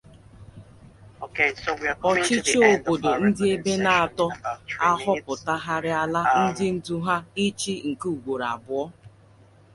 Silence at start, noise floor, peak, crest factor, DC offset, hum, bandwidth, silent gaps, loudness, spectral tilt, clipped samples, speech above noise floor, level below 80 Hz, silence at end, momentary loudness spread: 0.4 s; -53 dBFS; -4 dBFS; 20 dB; under 0.1%; none; 11.5 kHz; none; -23 LUFS; -4 dB/octave; under 0.1%; 30 dB; -56 dBFS; 0.65 s; 9 LU